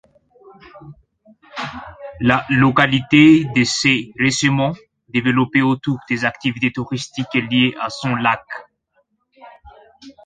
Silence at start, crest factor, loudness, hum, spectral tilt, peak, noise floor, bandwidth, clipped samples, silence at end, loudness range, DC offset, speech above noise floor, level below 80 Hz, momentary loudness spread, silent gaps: 0.75 s; 18 dB; -17 LUFS; none; -5 dB/octave; 0 dBFS; -65 dBFS; 9.4 kHz; under 0.1%; 0.15 s; 6 LU; under 0.1%; 48 dB; -52 dBFS; 16 LU; none